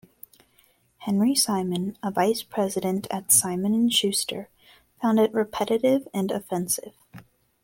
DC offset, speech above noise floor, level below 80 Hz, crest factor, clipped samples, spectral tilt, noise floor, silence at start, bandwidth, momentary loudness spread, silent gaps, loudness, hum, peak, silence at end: under 0.1%; 39 dB; -64 dBFS; 20 dB; under 0.1%; -3.5 dB/octave; -63 dBFS; 1 s; 17 kHz; 10 LU; none; -24 LUFS; none; -6 dBFS; 0.45 s